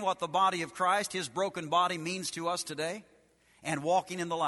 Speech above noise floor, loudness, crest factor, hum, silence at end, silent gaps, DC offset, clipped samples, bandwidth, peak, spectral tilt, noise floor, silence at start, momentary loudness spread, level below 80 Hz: 34 dB; -31 LUFS; 18 dB; none; 0 s; none; under 0.1%; under 0.1%; 12 kHz; -14 dBFS; -3.5 dB/octave; -65 dBFS; 0 s; 8 LU; -74 dBFS